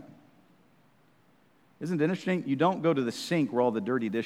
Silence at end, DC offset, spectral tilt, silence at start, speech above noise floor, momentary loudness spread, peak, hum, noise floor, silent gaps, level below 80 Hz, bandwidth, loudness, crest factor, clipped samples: 0 s; under 0.1%; -6.5 dB/octave; 0 s; 37 dB; 4 LU; -12 dBFS; none; -64 dBFS; none; -82 dBFS; 14.5 kHz; -28 LUFS; 18 dB; under 0.1%